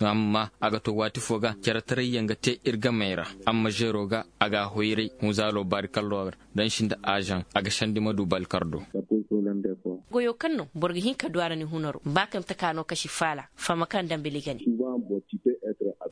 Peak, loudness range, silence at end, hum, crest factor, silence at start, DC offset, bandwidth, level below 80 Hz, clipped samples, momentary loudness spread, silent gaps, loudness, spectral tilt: -2 dBFS; 2 LU; 0 s; none; 26 dB; 0 s; under 0.1%; 10.5 kHz; -60 dBFS; under 0.1%; 5 LU; none; -28 LUFS; -5 dB/octave